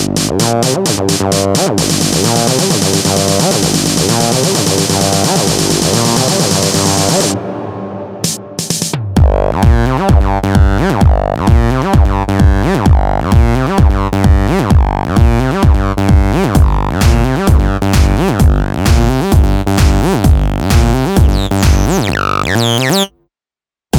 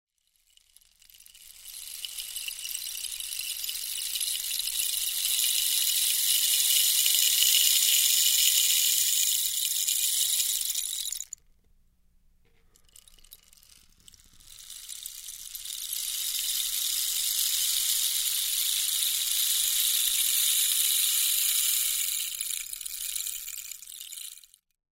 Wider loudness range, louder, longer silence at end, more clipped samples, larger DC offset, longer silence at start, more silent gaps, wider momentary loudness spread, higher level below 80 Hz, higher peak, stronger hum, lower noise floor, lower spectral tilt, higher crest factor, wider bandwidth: second, 2 LU vs 15 LU; first, -11 LUFS vs -24 LUFS; second, 0 s vs 0.55 s; neither; first, 0.2% vs under 0.1%; second, 0 s vs 1.4 s; neither; second, 3 LU vs 18 LU; first, -16 dBFS vs -64 dBFS; first, 0 dBFS vs -6 dBFS; second, none vs 60 Hz at -80 dBFS; first, under -90 dBFS vs -69 dBFS; first, -5 dB/octave vs 6 dB/octave; second, 10 dB vs 24 dB; first, 18.5 kHz vs 16.5 kHz